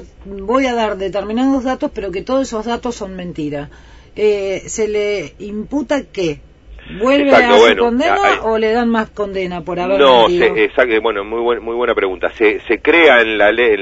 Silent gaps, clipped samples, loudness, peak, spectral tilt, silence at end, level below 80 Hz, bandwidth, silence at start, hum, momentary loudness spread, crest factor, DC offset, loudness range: none; under 0.1%; -14 LUFS; 0 dBFS; -4.5 dB/octave; 0 s; -40 dBFS; 8 kHz; 0 s; none; 15 LU; 14 dB; under 0.1%; 7 LU